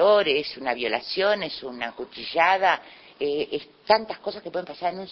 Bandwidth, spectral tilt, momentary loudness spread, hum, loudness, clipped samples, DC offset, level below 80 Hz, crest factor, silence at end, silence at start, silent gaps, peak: 6.2 kHz; -4.5 dB/octave; 13 LU; none; -25 LUFS; under 0.1%; under 0.1%; -64 dBFS; 20 dB; 0 s; 0 s; none; -4 dBFS